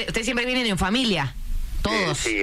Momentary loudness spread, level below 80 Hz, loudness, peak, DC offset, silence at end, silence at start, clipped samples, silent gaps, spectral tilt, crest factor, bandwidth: 9 LU; -32 dBFS; -23 LUFS; -12 dBFS; under 0.1%; 0 s; 0 s; under 0.1%; none; -3.5 dB/octave; 12 dB; 15.5 kHz